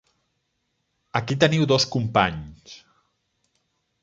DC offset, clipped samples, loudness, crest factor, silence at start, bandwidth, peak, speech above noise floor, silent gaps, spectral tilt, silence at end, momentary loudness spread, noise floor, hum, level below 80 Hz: under 0.1%; under 0.1%; -21 LUFS; 22 dB; 1.15 s; 7.8 kHz; -2 dBFS; 53 dB; none; -5 dB/octave; 1.25 s; 13 LU; -75 dBFS; none; -52 dBFS